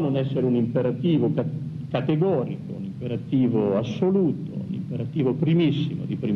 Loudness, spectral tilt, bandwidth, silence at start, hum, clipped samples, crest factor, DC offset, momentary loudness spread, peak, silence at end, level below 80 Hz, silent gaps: -24 LUFS; -9.5 dB/octave; 6.4 kHz; 0 s; none; under 0.1%; 14 dB; under 0.1%; 10 LU; -10 dBFS; 0 s; -60 dBFS; none